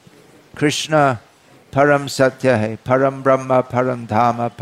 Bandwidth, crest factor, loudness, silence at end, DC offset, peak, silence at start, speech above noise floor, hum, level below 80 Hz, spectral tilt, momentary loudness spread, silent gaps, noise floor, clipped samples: 15 kHz; 14 dB; -17 LUFS; 0 s; under 0.1%; -4 dBFS; 0.55 s; 31 dB; none; -56 dBFS; -5.5 dB/octave; 5 LU; none; -47 dBFS; under 0.1%